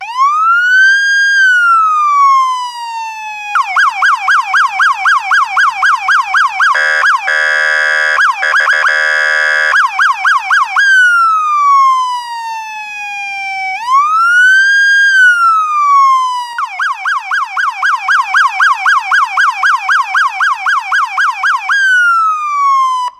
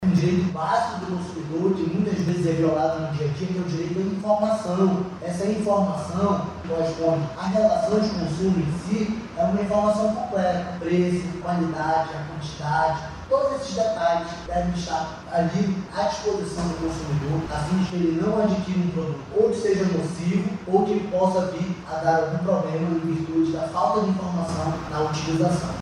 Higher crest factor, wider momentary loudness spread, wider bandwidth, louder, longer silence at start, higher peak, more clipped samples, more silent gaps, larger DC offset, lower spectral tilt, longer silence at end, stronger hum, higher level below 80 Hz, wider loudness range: second, 10 dB vs 16 dB; first, 10 LU vs 6 LU; first, 14.5 kHz vs 11 kHz; first, -9 LUFS vs -24 LUFS; about the same, 0 s vs 0 s; first, 0 dBFS vs -6 dBFS; neither; neither; neither; second, 3.5 dB/octave vs -7 dB/octave; about the same, 0.1 s vs 0 s; neither; second, -66 dBFS vs -46 dBFS; about the same, 3 LU vs 2 LU